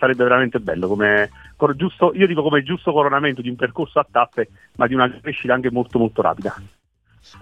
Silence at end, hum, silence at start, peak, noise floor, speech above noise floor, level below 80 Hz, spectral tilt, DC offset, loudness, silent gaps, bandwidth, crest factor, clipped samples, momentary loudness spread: 0.75 s; none; 0 s; -2 dBFS; -54 dBFS; 35 dB; -52 dBFS; -7.5 dB/octave; under 0.1%; -19 LUFS; none; 8.6 kHz; 18 dB; under 0.1%; 8 LU